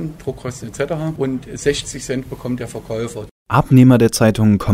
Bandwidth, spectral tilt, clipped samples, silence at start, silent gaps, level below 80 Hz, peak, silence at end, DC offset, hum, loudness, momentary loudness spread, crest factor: 16 kHz; -6.5 dB/octave; under 0.1%; 0 s; 3.31-3.46 s; -40 dBFS; 0 dBFS; 0 s; under 0.1%; none; -17 LUFS; 16 LU; 16 dB